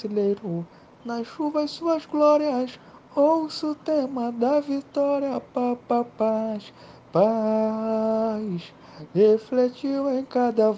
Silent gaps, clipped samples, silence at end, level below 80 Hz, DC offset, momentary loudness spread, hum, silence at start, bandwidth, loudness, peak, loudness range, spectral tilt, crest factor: none; under 0.1%; 0 s; -68 dBFS; under 0.1%; 12 LU; none; 0 s; 7.8 kHz; -24 LUFS; -8 dBFS; 2 LU; -7.5 dB/octave; 16 dB